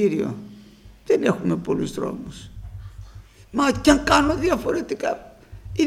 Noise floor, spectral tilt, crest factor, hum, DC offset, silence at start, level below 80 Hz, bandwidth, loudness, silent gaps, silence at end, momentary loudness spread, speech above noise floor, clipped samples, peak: -47 dBFS; -5 dB/octave; 22 dB; none; under 0.1%; 0 s; -40 dBFS; 15 kHz; -22 LUFS; none; 0 s; 22 LU; 26 dB; under 0.1%; 0 dBFS